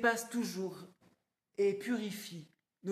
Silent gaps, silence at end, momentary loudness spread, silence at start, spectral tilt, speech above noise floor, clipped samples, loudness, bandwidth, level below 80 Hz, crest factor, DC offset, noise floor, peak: none; 0 s; 18 LU; 0 s; -4.5 dB/octave; 38 dB; under 0.1%; -37 LUFS; 14.5 kHz; -82 dBFS; 22 dB; under 0.1%; -73 dBFS; -16 dBFS